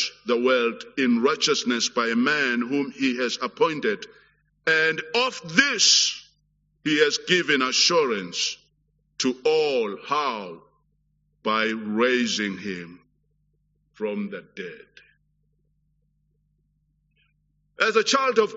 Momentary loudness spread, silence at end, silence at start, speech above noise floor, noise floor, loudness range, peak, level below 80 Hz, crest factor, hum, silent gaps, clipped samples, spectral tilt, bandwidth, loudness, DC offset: 14 LU; 0 s; 0 s; 46 dB; -69 dBFS; 16 LU; -2 dBFS; -70 dBFS; 24 dB; none; none; under 0.1%; -1 dB/octave; 8 kHz; -22 LUFS; under 0.1%